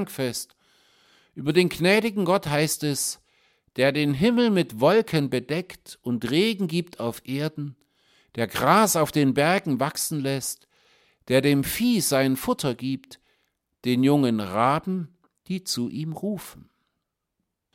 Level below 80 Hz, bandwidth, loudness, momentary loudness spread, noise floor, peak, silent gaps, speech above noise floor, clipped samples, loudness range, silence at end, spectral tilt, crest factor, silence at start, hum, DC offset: -58 dBFS; 16.5 kHz; -24 LUFS; 13 LU; -80 dBFS; -4 dBFS; none; 57 dB; under 0.1%; 3 LU; 1.15 s; -4.5 dB/octave; 20 dB; 0 s; none; under 0.1%